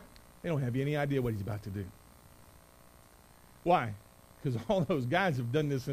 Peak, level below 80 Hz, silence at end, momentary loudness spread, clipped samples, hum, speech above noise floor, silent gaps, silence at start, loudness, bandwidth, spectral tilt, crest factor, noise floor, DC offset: -14 dBFS; -58 dBFS; 0 s; 12 LU; under 0.1%; none; 27 dB; none; 0 s; -33 LUFS; 15.5 kHz; -7 dB/octave; 20 dB; -58 dBFS; under 0.1%